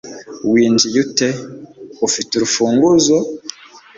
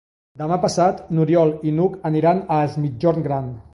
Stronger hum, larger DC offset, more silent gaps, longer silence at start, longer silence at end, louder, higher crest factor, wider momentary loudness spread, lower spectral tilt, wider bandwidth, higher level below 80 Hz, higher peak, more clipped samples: neither; neither; neither; second, 0.05 s vs 0.35 s; about the same, 0.2 s vs 0.15 s; first, -15 LUFS vs -20 LUFS; about the same, 16 dB vs 14 dB; first, 19 LU vs 7 LU; second, -3.5 dB/octave vs -7.5 dB/octave; second, 7.8 kHz vs 11.5 kHz; about the same, -56 dBFS vs -52 dBFS; first, 0 dBFS vs -4 dBFS; neither